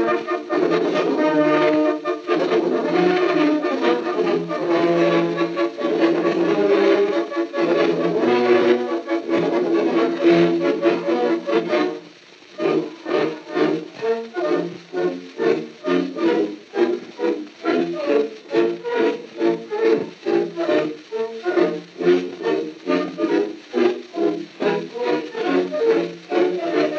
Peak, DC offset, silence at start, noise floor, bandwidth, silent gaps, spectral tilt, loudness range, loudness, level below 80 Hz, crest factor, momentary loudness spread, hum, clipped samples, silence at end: -4 dBFS; under 0.1%; 0 s; -45 dBFS; 7.2 kHz; none; -6.5 dB/octave; 4 LU; -20 LUFS; -80 dBFS; 16 dB; 7 LU; none; under 0.1%; 0 s